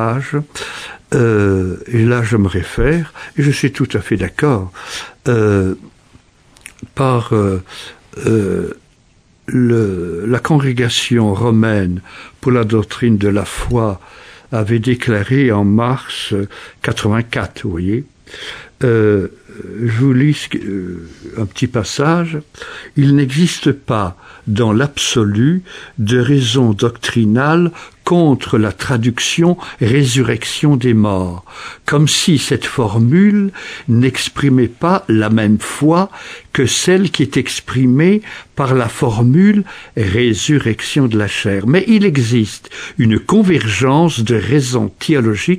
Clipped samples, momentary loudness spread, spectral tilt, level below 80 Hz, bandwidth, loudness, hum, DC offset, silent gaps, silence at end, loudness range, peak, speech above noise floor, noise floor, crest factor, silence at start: under 0.1%; 12 LU; -6 dB/octave; -38 dBFS; 14 kHz; -14 LUFS; none; under 0.1%; none; 0 s; 4 LU; 0 dBFS; 37 dB; -51 dBFS; 14 dB; 0 s